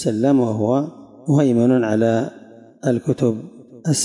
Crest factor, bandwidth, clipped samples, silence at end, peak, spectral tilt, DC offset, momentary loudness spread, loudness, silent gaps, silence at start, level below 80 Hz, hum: 14 dB; 11.5 kHz; under 0.1%; 0 s; -6 dBFS; -6.5 dB/octave; under 0.1%; 14 LU; -19 LUFS; none; 0 s; -64 dBFS; none